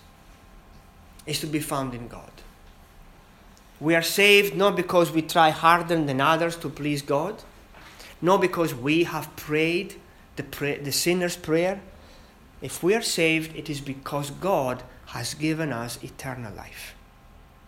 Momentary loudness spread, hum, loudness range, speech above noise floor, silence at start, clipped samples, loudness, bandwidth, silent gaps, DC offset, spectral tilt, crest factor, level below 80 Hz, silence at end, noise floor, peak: 19 LU; none; 10 LU; 27 dB; 0.3 s; under 0.1%; -24 LUFS; 18 kHz; none; under 0.1%; -4 dB/octave; 24 dB; -52 dBFS; 0.75 s; -51 dBFS; -2 dBFS